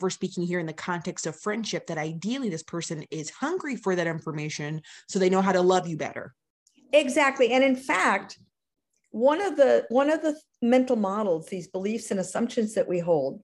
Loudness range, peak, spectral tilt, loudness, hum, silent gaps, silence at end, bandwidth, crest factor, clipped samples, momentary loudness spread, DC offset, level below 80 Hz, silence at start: 7 LU; -8 dBFS; -5 dB/octave; -26 LUFS; none; 6.50-6.66 s; 0.05 s; 12 kHz; 18 dB; under 0.1%; 12 LU; under 0.1%; -72 dBFS; 0 s